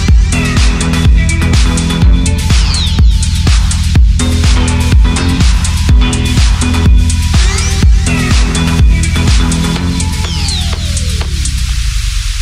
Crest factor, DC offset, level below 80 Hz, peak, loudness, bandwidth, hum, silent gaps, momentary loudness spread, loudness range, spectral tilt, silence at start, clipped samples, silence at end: 8 dB; under 0.1%; -10 dBFS; 0 dBFS; -11 LUFS; 14 kHz; none; none; 5 LU; 2 LU; -4.5 dB/octave; 0 s; under 0.1%; 0 s